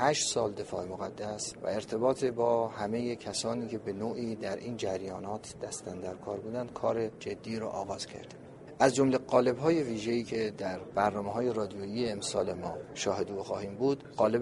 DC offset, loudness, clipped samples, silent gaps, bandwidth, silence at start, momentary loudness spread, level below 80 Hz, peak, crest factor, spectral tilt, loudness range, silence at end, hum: under 0.1%; -33 LUFS; under 0.1%; none; 11.5 kHz; 0 s; 12 LU; -64 dBFS; -8 dBFS; 24 dB; -4.5 dB/octave; 7 LU; 0 s; none